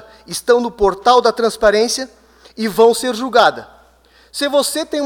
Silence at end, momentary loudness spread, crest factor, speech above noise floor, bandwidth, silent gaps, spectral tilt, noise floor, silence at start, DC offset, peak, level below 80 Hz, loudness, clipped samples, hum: 0 s; 11 LU; 16 dB; 35 dB; 18 kHz; none; -2.5 dB/octave; -50 dBFS; 0.3 s; under 0.1%; 0 dBFS; -44 dBFS; -15 LUFS; under 0.1%; none